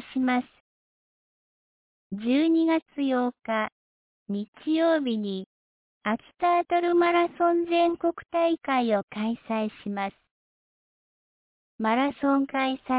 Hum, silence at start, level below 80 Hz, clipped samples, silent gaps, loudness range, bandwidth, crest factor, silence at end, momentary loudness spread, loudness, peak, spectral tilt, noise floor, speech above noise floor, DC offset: none; 0 s; -68 dBFS; under 0.1%; 0.60-2.10 s, 2.82-2.86 s, 3.72-4.26 s, 4.48-4.53 s, 5.46-6.01 s, 9.03-9.08 s, 10.31-11.79 s; 5 LU; 4 kHz; 14 dB; 0 s; 11 LU; -26 LUFS; -12 dBFS; -9.5 dB/octave; under -90 dBFS; over 65 dB; under 0.1%